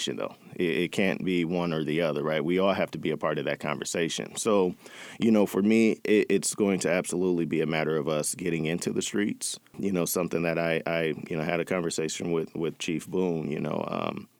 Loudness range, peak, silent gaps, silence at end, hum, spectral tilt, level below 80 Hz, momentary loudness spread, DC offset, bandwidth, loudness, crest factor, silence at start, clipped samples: 4 LU; -10 dBFS; none; 0.15 s; none; -4.5 dB/octave; -66 dBFS; 8 LU; under 0.1%; over 20 kHz; -28 LUFS; 16 dB; 0 s; under 0.1%